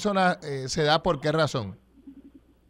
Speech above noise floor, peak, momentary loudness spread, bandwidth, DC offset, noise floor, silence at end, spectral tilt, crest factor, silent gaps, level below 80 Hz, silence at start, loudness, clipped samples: 28 dB; -8 dBFS; 9 LU; 12.5 kHz; under 0.1%; -53 dBFS; 0.4 s; -5 dB/octave; 20 dB; none; -52 dBFS; 0 s; -25 LUFS; under 0.1%